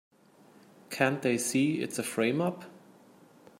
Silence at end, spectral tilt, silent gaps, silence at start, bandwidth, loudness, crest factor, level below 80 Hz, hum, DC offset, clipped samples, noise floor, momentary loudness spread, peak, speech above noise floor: 0.8 s; -4.5 dB/octave; none; 0.9 s; 16 kHz; -29 LUFS; 22 dB; -76 dBFS; none; under 0.1%; under 0.1%; -59 dBFS; 15 LU; -10 dBFS; 30 dB